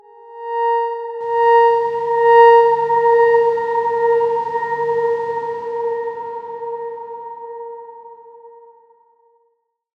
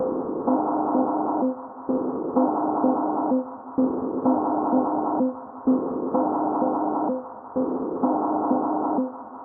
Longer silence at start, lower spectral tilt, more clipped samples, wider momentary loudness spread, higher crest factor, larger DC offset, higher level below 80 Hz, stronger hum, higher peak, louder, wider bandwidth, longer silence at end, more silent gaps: first, 0.25 s vs 0 s; second, -5 dB/octave vs -12.5 dB/octave; neither; first, 20 LU vs 5 LU; about the same, 16 dB vs 16 dB; neither; about the same, -66 dBFS vs -66 dBFS; neither; first, -2 dBFS vs -8 dBFS; first, -16 LUFS vs -24 LUFS; first, 5.8 kHz vs 1.9 kHz; first, 1.5 s vs 0 s; neither